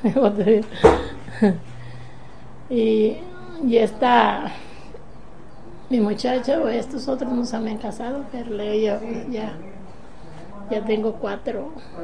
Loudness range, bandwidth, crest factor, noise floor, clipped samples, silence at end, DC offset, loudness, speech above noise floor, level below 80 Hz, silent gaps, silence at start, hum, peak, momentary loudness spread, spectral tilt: 6 LU; 10 kHz; 22 dB; -43 dBFS; under 0.1%; 0 s; 2%; -22 LUFS; 22 dB; -44 dBFS; none; 0 s; none; 0 dBFS; 23 LU; -6.5 dB/octave